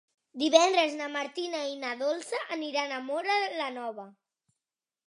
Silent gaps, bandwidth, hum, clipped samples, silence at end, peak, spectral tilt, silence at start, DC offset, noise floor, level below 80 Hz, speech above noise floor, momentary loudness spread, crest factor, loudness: none; 11.5 kHz; none; under 0.1%; 0.95 s; -6 dBFS; -1 dB/octave; 0.35 s; under 0.1%; under -90 dBFS; -90 dBFS; over 61 dB; 12 LU; 26 dB; -29 LUFS